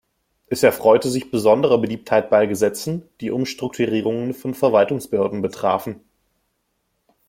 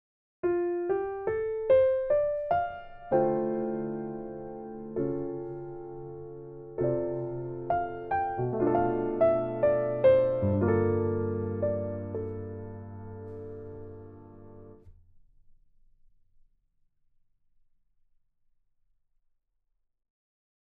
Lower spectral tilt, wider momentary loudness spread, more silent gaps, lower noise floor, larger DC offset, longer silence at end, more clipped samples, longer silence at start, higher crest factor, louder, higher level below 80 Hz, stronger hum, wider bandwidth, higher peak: second, -5.5 dB/octave vs -11.5 dB/octave; second, 11 LU vs 18 LU; neither; second, -71 dBFS vs -76 dBFS; neither; second, 1.35 s vs 5.9 s; neither; about the same, 0.5 s vs 0.45 s; about the same, 18 dB vs 20 dB; first, -19 LUFS vs -29 LUFS; about the same, -60 dBFS vs -56 dBFS; neither; first, 16.5 kHz vs 4 kHz; first, -2 dBFS vs -12 dBFS